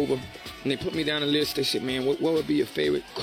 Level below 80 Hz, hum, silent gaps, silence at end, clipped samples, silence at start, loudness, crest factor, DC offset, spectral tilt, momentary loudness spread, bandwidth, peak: -56 dBFS; none; none; 0 s; under 0.1%; 0 s; -26 LUFS; 14 dB; under 0.1%; -4.5 dB/octave; 6 LU; 17 kHz; -12 dBFS